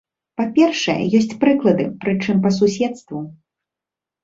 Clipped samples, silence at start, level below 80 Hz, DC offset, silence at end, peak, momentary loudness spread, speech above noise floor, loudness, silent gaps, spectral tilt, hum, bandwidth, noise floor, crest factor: under 0.1%; 0.4 s; -58 dBFS; under 0.1%; 0.9 s; -2 dBFS; 15 LU; 70 dB; -18 LUFS; none; -6 dB/octave; none; 7.8 kHz; -87 dBFS; 16 dB